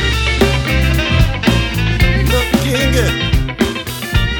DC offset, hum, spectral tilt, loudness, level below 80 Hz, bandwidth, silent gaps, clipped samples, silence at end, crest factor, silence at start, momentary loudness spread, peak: under 0.1%; none; -5 dB/octave; -14 LUFS; -18 dBFS; over 20 kHz; none; under 0.1%; 0 s; 14 dB; 0 s; 4 LU; 0 dBFS